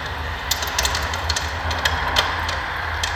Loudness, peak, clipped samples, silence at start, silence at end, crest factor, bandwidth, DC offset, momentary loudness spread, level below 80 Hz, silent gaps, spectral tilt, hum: -22 LUFS; -2 dBFS; under 0.1%; 0 s; 0 s; 20 dB; 19 kHz; under 0.1%; 5 LU; -32 dBFS; none; -2 dB/octave; none